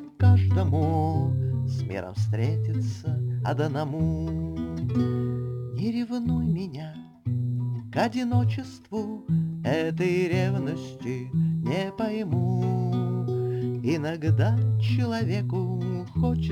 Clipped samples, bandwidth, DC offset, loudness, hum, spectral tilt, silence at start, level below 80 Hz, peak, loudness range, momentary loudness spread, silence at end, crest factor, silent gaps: under 0.1%; 9.2 kHz; under 0.1%; -27 LUFS; none; -8.5 dB/octave; 0 s; -48 dBFS; -8 dBFS; 3 LU; 8 LU; 0 s; 16 dB; none